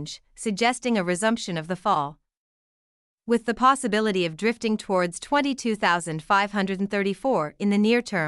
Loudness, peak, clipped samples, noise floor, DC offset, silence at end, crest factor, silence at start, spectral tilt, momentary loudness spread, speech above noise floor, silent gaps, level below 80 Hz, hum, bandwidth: -24 LUFS; -6 dBFS; under 0.1%; under -90 dBFS; under 0.1%; 0 s; 18 dB; 0 s; -4.5 dB/octave; 7 LU; over 66 dB; 2.37-3.18 s; -60 dBFS; none; 12 kHz